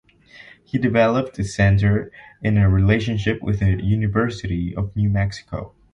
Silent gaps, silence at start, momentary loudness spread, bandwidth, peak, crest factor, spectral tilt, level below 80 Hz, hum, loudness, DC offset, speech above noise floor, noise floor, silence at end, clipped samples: none; 0.35 s; 10 LU; 8.8 kHz; -4 dBFS; 16 dB; -7.5 dB/octave; -34 dBFS; none; -20 LUFS; under 0.1%; 27 dB; -46 dBFS; 0.25 s; under 0.1%